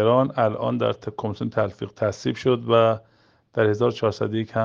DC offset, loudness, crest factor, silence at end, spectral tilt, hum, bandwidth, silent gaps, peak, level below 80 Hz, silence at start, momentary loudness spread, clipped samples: under 0.1%; -23 LUFS; 18 dB; 0 s; -7 dB/octave; none; 7.4 kHz; none; -4 dBFS; -62 dBFS; 0 s; 10 LU; under 0.1%